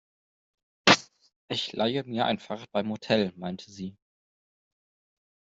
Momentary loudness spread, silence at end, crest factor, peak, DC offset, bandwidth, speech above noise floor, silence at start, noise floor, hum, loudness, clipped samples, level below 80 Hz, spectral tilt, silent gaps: 17 LU; 1.7 s; 26 dB; -4 dBFS; under 0.1%; 8 kHz; over 60 dB; 0.85 s; under -90 dBFS; none; -27 LUFS; under 0.1%; -68 dBFS; -4 dB/octave; 1.36-1.48 s